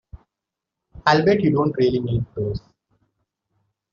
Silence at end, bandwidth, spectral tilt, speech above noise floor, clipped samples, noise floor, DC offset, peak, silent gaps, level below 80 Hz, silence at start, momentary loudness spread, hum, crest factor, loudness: 1.35 s; 7.2 kHz; -5.5 dB/octave; 66 dB; under 0.1%; -85 dBFS; under 0.1%; -2 dBFS; none; -46 dBFS; 0.15 s; 11 LU; none; 20 dB; -20 LUFS